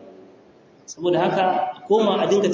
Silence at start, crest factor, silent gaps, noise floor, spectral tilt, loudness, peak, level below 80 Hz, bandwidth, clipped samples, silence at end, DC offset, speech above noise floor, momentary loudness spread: 0 s; 16 dB; none; -51 dBFS; -5.5 dB/octave; -20 LUFS; -6 dBFS; -66 dBFS; 7.6 kHz; under 0.1%; 0 s; under 0.1%; 32 dB; 7 LU